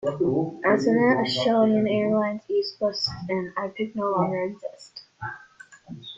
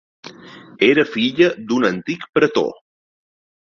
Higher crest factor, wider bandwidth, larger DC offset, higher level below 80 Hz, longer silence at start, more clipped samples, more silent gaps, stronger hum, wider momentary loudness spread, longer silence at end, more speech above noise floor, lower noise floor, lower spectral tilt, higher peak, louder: about the same, 16 dB vs 18 dB; about the same, 7.8 kHz vs 7.2 kHz; neither; about the same, -62 dBFS vs -60 dBFS; second, 0 s vs 0.25 s; neither; second, none vs 2.29-2.33 s; neither; first, 18 LU vs 10 LU; second, 0 s vs 0.9 s; about the same, 26 dB vs 24 dB; first, -50 dBFS vs -41 dBFS; about the same, -6 dB/octave vs -5.5 dB/octave; second, -8 dBFS vs -2 dBFS; second, -24 LUFS vs -18 LUFS